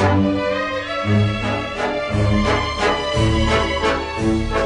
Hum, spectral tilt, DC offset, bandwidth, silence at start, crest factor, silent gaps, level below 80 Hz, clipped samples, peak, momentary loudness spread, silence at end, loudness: none; -6 dB/octave; under 0.1%; 10.5 kHz; 0 s; 14 dB; none; -30 dBFS; under 0.1%; -4 dBFS; 5 LU; 0 s; -19 LUFS